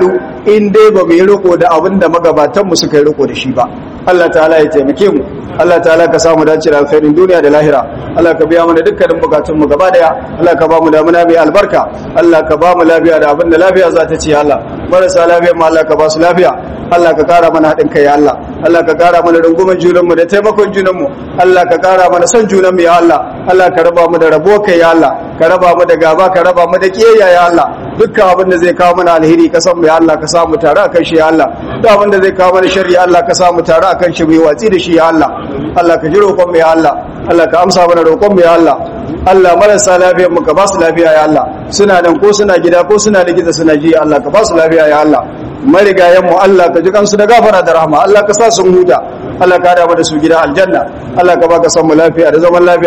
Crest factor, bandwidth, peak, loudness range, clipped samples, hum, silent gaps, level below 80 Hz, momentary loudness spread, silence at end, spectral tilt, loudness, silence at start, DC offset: 6 dB; 12 kHz; 0 dBFS; 2 LU; 8%; none; none; -36 dBFS; 5 LU; 0 s; -5 dB/octave; -7 LUFS; 0 s; under 0.1%